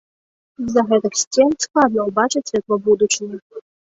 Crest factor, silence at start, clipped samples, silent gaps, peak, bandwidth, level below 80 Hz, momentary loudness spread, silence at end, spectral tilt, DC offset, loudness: 18 dB; 0.6 s; under 0.1%; 1.27-1.31 s, 3.42-3.50 s; 0 dBFS; 8.2 kHz; -58 dBFS; 6 LU; 0.4 s; -3 dB/octave; under 0.1%; -17 LUFS